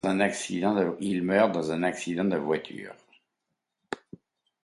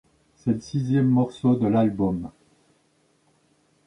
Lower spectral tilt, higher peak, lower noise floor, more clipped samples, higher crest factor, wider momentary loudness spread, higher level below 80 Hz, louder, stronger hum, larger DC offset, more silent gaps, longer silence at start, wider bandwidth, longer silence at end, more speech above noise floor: second, -5.5 dB/octave vs -9 dB/octave; about the same, -8 dBFS vs -10 dBFS; first, -83 dBFS vs -65 dBFS; neither; about the same, 20 dB vs 16 dB; first, 16 LU vs 10 LU; second, -66 dBFS vs -54 dBFS; second, -27 LUFS vs -23 LUFS; neither; neither; neither; second, 0.05 s vs 0.45 s; first, 11.5 kHz vs 10 kHz; second, 0.65 s vs 1.55 s; first, 56 dB vs 43 dB